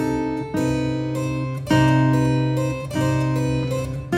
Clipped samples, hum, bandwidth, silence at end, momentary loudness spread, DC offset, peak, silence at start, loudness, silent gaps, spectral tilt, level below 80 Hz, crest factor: under 0.1%; none; 14 kHz; 0 s; 8 LU; under 0.1%; -4 dBFS; 0 s; -21 LUFS; none; -7 dB/octave; -40 dBFS; 16 dB